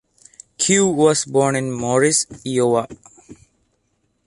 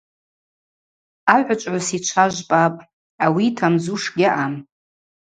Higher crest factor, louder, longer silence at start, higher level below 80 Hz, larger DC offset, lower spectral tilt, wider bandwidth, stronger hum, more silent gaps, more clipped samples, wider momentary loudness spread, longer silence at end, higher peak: about the same, 18 dB vs 20 dB; about the same, -17 LUFS vs -19 LUFS; second, 0.6 s vs 1.25 s; first, -58 dBFS vs -64 dBFS; neither; about the same, -4 dB/octave vs -4.5 dB/octave; first, 11.5 kHz vs 9.6 kHz; neither; second, none vs 2.93-3.18 s; neither; about the same, 7 LU vs 6 LU; first, 0.9 s vs 0.75 s; about the same, -2 dBFS vs 0 dBFS